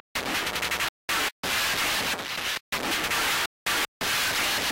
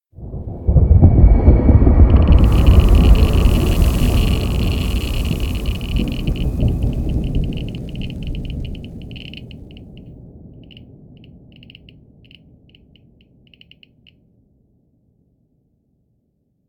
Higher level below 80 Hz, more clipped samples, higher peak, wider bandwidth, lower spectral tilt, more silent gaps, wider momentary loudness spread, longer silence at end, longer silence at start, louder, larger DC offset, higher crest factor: second, -52 dBFS vs -18 dBFS; neither; second, -18 dBFS vs 0 dBFS; about the same, 17 kHz vs 17.5 kHz; second, -0.5 dB/octave vs -7.5 dB/octave; first, 0.89-1.08 s, 1.32-1.43 s, 2.60-2.72 s, 3.46-3.66 s, 3.88-4.00 s vs none; second, 5 LU vs 21 LU; second, 0 s vs 6.55 s; about the same, 0.15 s vs 0.2 s; second, -26 LUFS vs -16 LUFS; neither; second, 10 dB vs 16 dB